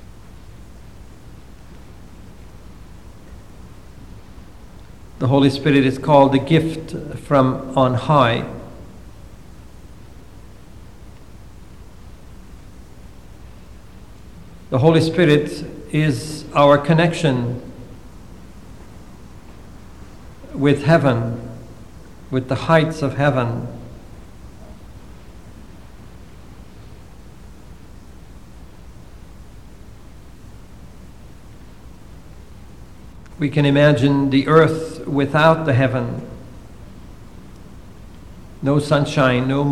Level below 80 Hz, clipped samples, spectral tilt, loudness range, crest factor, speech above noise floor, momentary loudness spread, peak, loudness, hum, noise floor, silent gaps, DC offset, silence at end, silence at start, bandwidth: -44 dBFS; under 0.1%; -7 dB/octave; 10 LU; 20 dB; 25 dB; 28 LU; 0 dBFS; -17 LUFS; none; -41 dBFS; none; 0.7%; 0 s; 0.35 s; 13 kHz